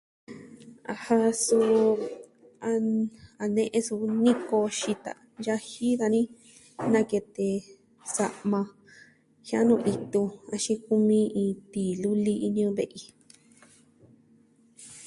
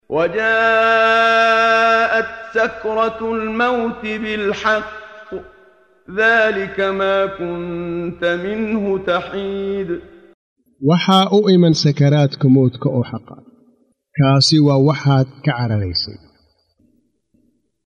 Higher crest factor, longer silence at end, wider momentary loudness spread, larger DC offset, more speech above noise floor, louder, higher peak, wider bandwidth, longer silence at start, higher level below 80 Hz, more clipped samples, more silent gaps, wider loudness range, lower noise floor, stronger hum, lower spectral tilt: about the same, 18 dB vs 16 dB; second, 0 s vs 1.7 s; first, 15 LU vs 12 LU; neither; second, 35 dB vs 46 dB; second, -27 LUFS vs -16 LUFS; second, -10 dBFS vs -2 dBFS; first, 11.5 kHz vs 10 kHz; first, 0.3 s vs 0.1 s; second, -70 dBFS vs -50 dBFS; neither; second, none vs 10.34-10.56 s; about the same, 4 LU vs 6 LU; about the same, -61 dBFS vs -61 dBFS; neither; about the same, -5 dB/octave vs -6 dB/octave